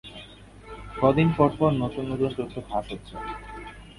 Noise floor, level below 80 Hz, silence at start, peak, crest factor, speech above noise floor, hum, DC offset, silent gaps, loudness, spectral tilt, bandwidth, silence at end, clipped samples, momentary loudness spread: -46 dBFS; -46 dBFS; 0.05 s; -4 dBFS; 22 dB; 22 dB; none; under 0.1%; none; -25 LUFS; -8.5 dB/octave; 11.5 kHz; 0.05 s; under 0.1%; 22 LU